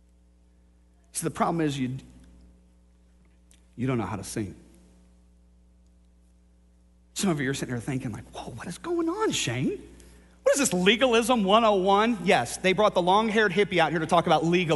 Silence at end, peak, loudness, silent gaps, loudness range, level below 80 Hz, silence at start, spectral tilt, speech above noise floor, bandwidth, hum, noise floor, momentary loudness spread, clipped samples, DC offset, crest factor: 0 s; -4 dBFS; -25 LUFS; none; 14 LU; -54 dBFS; 1.15 s; -4.5 dB/octave; 34 dB; 11.5 kHz; none; -59 dBFS; 15 LU; under 0.1%; under 0.1%; 22 dB